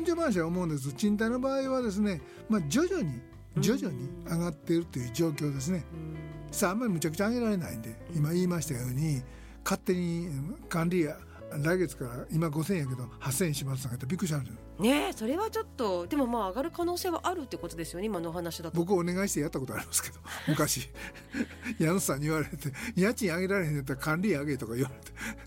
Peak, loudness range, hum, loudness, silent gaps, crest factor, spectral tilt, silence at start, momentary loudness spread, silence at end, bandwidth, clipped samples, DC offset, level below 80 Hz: -12 dBFS; 2 LU; none; -31 LUFS; none; 18 dB; -5.5 dB/octave; 0 s; 9 LU; 0 s; 16.5 kHz; under 0.1%; under 0.1%; -52 dBFS